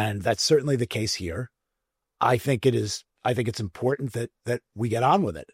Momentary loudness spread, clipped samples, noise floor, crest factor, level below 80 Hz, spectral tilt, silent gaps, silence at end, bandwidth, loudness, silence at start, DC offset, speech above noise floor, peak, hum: 10 LU; under 0.1%; -83 dBFS; 18 dB; -58 dBFS; -5 dB/octave; none; 0.1 s; 16 kHz; -25 LUFS; 0 s; under 0.1%; 58 dB; -8 dBFS; none